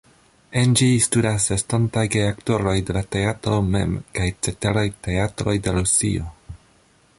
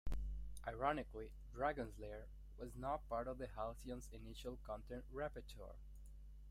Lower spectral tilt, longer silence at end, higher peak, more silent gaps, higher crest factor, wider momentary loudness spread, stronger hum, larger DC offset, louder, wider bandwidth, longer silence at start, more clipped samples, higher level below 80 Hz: second, -4.5 dB/octave vs -6 dB/octave; first, 0.6 s vs 0 s; first, -4 dBFS vs -26 dBFS; neither; about the same, 18 dB vs 20 dB; second, 8 LU vs 15 LU; neither; neither; first, -21 LUFS vs -48 LUFS; second, 11.5 kHz vs 15.5 kHz; first, 0.5 s vs 0.05 s; neither; first, -38 dBFS vs -54 dBFS